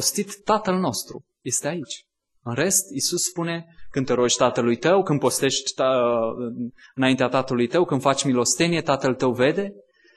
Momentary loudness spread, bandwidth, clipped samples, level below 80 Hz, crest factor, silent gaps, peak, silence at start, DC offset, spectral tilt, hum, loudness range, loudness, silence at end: 12 LU; 12.5 kHz; under 0.1%; -60 dBFS; 18 dB; none; -4 dBFS; 0 s; under 0.1%; -3.5 dB/octave; none; 3 LU; -22 LUFS; 0.35 s